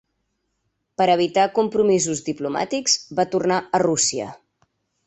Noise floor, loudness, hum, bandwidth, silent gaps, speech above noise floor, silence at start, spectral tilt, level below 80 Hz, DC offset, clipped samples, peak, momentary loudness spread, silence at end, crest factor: -74 dBFS; -20 LUFS; none; 8.4 kHz; none; 53 dB; 1 s; -3 dB/octave; -62 dBFS; under 0.1%; under 0.1%; -4 dBFS; 8 LU; 0.75 s; 18 dB